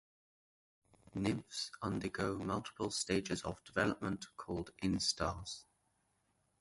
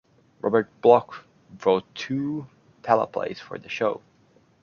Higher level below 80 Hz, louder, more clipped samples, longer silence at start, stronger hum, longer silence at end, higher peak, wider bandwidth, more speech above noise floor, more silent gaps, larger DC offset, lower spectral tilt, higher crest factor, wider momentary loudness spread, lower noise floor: first, -60 dBFS vs -68 dBFS; second, -39 LUFS vs -24 LUFS; neither; first, 1.15 s vs 0.45 s; neither; first, 1 s vs 0.65 s; second, -20 dBFS vs -2 dBFS; first, 11.5 kHz vs 7 kHz; first, 40 dB vs 36 dB; neither; neither; second, -4 dB/octave vs -6.5 dB/octave; about the same, 20 dB vs 22 dB; second, 9 LU vs 19 LU; first, -79 dBFS vs -60 dBFS